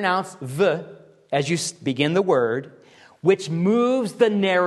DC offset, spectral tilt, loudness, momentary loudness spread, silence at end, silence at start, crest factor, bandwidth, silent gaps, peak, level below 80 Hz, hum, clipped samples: under 0.1%; -5 dB/octave; -22 LUFS; 7 LU; 0 s; 0 s; 18 dB; 12.5 kHz; none; -4 dBFS; -68 dBFS; none; under 0.1%